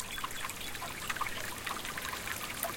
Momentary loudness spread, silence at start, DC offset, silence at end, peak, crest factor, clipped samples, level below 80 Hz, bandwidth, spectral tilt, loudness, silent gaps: 3 LU; 0 s; under 0.1%; 0 s; -14 dBFS; 24 dB; under 0.1%; -54 dBFS; 17 kHz; -1.5 dB/octave; -37 LUFS; none